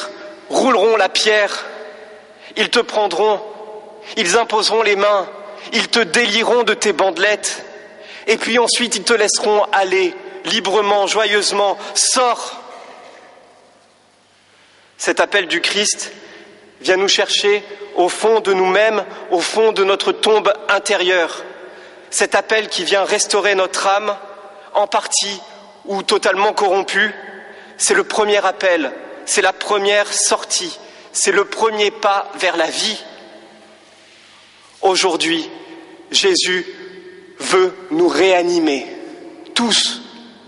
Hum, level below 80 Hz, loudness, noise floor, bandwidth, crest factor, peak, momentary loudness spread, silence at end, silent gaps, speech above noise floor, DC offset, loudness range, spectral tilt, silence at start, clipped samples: none; -66 dBFS; -16 LUFS; -52 dBFS; 11.5 kHz; 16 dB; 0 dBFS; 16 LU; 0.2 s; none; 37 dB; under 0.1%; 5 LU; -1 dB/octave; 0 s; under 0.1%